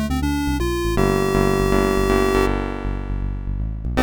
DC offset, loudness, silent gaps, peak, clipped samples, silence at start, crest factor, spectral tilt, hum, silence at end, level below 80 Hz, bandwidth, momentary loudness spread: 0.2%; -21 LUFS; none; -6 dBFS; under 0.1%; 0 s; 14 dB; -6 dB/octave; none; 0 s; -26 dBFS; over 20 kHz; 10 LU